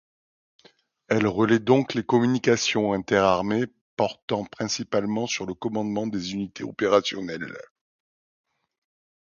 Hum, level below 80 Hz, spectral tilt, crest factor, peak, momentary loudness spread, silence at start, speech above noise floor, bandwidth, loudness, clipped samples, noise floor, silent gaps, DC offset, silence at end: none; -60 dBFS; -5 dB/octave; 20 dB; -4 dBFS; 11 LU; 1.1 s; 35 dB; 7.4 kHz; -24 LUFS; under 0.1%; -59 dBFS; 3.81-3.97 s, 4.22-4.28 s; under 0.1%; 1.6 s